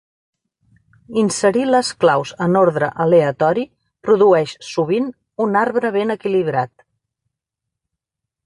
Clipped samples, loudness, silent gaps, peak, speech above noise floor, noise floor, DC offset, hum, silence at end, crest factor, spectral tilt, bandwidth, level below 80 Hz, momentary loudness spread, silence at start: under 0.1%; -17 LUFS; none; -2 dBFS; 66 dB; -83 dBFS; under 0.1%; none; 1.8 s; 16 dB; -5.5 dB/octave; 11.5 kHz; -60 dBFS; 9 LU; 1.1 s